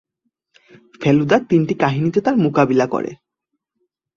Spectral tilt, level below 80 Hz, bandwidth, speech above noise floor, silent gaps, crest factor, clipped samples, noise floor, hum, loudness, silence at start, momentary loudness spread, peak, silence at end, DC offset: -7.5 dB/octave; -58 dBFS; 7.2 kHz; 61 dB; none; 16 dB; under 0.1%; -77 dBFS; none; -17 LUFS; 1 s; 7 LU; -2 dBFS; 1 s; under 0.1%